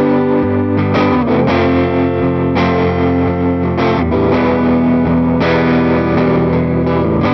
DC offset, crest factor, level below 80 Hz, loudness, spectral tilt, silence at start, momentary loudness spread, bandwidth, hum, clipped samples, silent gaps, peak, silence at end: under 0.1%; 10 dB; -32 dBFS; -13 LUFS; -9 dB/octave; 0 s; 2 LU; 6.2 kHz; none; under 0.1%; none; -2 dBFS; 0 s